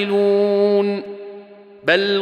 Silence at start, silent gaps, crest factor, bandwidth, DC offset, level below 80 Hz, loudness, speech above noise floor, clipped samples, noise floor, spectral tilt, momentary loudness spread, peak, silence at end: 0 s; none; 16 dB; 8.8 kHz; under 0.1%; -72 dBFS; -17 LUFS; 24 dB; under 0.1%; -40 dBFS; -6.5 dB/octave; 18 LU; -2 dBFS; 0 s